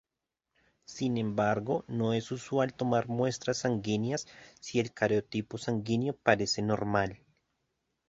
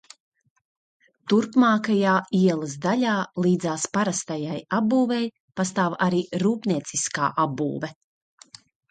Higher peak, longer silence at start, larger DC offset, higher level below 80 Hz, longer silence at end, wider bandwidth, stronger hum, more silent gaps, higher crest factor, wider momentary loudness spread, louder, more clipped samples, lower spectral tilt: about the same, -8 dBFS vs -8 dBFS; second, 0.9 s vs 1.25 s; neither; first, -62 dBFS vs -68 dBFS; about the same, 0.95 s vs 1 s; second, 8 kHz vs 9.4 kHz; neither; second, none vs 5.40-5.48 s; first, 24 dB vs 16 dB; about the same, 7 LU vs 9 LU; second, -31 LUFS vs -23 LUFS; neither; about the same, -5.5 dB/octave vs -5 dB/octave